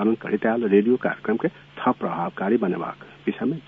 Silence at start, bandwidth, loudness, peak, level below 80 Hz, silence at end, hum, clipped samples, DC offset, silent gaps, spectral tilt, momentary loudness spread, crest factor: 0 s; 4.5 kHz; -24 LUFS; -6 dBFS; -64 dBFS; 0.05 s; none; under 0.1%; under 0.1%; none; -9.5 dB/octave; 11 LU; 18 dB